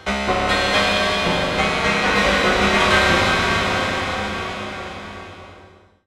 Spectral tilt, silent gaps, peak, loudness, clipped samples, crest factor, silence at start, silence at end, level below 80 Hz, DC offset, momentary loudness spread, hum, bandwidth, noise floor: -3.5 dB/octave; none; -4 dBFS; -18 LUFS; under 0.1%; 16 dB; 0 s; 0.4 s; -36 dBFS; under 0.1%; 16 LU; none; 15.5 kHz; -47 dBFS